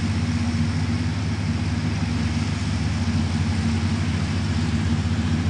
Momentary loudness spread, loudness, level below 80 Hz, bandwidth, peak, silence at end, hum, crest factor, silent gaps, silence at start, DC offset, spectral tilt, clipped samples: 2 LU; -24 LUFS; -38 dBFS; 11 kHz; -10 dBFS; 0 s; none; 12 dB; none; 0 s; under 0.1%; -6 dB/octave; under 0.1%